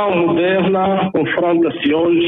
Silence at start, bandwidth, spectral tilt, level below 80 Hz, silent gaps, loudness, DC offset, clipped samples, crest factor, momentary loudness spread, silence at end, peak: 0 s; 4 kHz; -9.5 dB/octave; -52 dBFS; none; -15 LUFS; under 0.1%; under 0.1%; 8 dB; 2 LU; 0 s; -6 dBFS